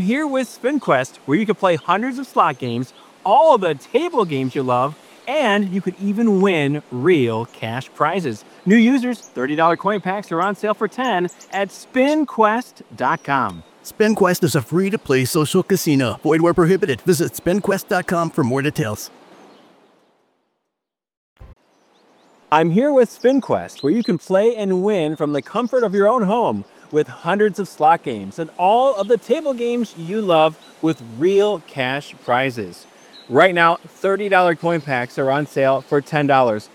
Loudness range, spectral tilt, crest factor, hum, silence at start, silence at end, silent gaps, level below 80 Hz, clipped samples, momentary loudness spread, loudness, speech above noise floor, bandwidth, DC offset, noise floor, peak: 3 LU; -6 dB/octave; 18 dB; none; 0 s; 0.1 s; 21.17-21.36 s; -58 dBFS; under 0.1%; 9 LU; -18 LUFS; 64 dB; 18.5 kHz; under 0.1%; -82 dBFS; 0 dBFS